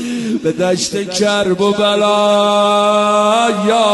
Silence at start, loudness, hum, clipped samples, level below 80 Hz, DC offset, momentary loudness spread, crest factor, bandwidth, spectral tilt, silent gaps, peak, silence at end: 0 s; -13 LUFS; none; under 0.1%; -54 dBFS; under 0.1%; 5 LU; 12 dB; 12 kHz; -4 dB/octave; none; -2 dBFS; 0 s